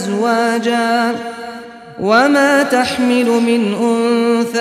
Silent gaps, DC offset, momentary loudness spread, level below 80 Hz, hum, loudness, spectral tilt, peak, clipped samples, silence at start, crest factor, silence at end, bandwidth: none; under 0.1%; 15 LU; -56 dBFS; none; -14 LUFS; -4.5 dB/octave; -2 dBFS; under 0.1%; 0 s; 12 dB; 0 s; 14.5 kHz